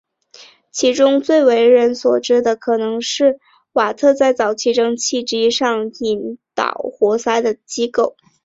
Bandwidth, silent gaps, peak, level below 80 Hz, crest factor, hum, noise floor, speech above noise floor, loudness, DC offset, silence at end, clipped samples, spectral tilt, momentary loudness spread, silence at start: 7.8 kHz; none; -2 dBFS; -62 dBFS; 14 dB; none; -45 dBFS; 30 dB; -16 LUFS; under 0.1%; 0.35 s; under 0.1%; -2.5 dB/octave; 9 LU; 0.4 s